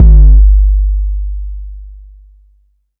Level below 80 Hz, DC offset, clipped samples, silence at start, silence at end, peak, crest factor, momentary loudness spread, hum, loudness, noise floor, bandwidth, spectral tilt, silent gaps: -8 dBFS; under 0.1%; 7%; 0 s; 1.05 s; 0 dBFS; 8 dB; 23 LU; none; -11 LUFS; -53 dBFS; 0.8 kHz; -13.5 dB/octave; none